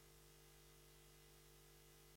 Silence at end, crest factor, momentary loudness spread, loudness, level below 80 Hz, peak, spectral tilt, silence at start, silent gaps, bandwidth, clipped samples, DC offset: 0 s; 16 dB; 0 LU; -66 LUFS; -72 dBFS; -52 dBFS; -3 dB/octave; 0 s; none; 16.5 kHz; under 0.1%; under 0.1%